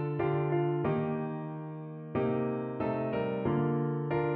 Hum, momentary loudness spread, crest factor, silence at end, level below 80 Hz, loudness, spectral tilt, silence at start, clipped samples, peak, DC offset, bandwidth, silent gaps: none; 9 LU; 14 dB; 0 s; -62 dBFS; -32 LUFS; -8 dB/octave; 0 s; under 0.1%; -18 dBFS; under 0.1%; 4.3 kHz; none